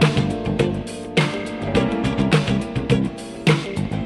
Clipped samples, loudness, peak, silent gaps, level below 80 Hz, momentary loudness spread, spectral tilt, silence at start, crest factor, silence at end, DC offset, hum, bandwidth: under 0.1%; -21 LUFS; -2 dBFS; none; -38 dBFS; 6 LU; -6.5 dB/octave; 0 s; 18 dB; 0 s; under 0.1%; none; 12 kHz